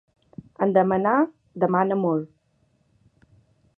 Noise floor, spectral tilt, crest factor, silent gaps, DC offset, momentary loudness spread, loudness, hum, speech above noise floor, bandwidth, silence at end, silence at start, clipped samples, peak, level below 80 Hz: -66 dBFS; -10.5 dB/octave; 20 dB; none; under 0.1%; 8 LU; -22 LUFS; none; 45 dB; 3.6 kHz; 1.5 s; 0.6 s; under 0.1%; -6 dBFS; -66 dBFS